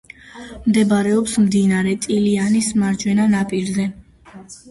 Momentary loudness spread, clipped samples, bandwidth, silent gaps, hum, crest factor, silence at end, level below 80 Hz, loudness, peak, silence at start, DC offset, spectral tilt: 12 LU; under 0.1%; 11.5 kHz; none; none; 14 dB; 0 s; -48 dBFS; -18 LUFS; -4 dBFS; 0.35 s; under 0.1%; -5.5 dB/octave